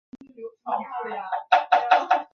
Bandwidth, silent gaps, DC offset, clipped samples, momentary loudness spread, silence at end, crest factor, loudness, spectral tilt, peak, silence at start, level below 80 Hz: 6.6 kHz; none; under 0.1%; under 0.1%; 19 LU; 0.1 s; 20 dB; -23 LUFS; -3 dB/octave; -4 dBFS; 0.4 s; -78 dBFS